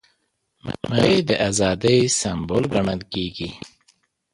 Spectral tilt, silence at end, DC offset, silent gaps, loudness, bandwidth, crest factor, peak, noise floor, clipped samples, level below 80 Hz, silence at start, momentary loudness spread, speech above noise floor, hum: -4.5 dB/octave; 0.65 s; under 0.1%; none; -20 LUFS; 11.5 kHz; 20 dB; -2 dBFS; -70 dBFS; under 0.1%; -46 dBFS; 0.65 s; 15 LU; 50 dB; none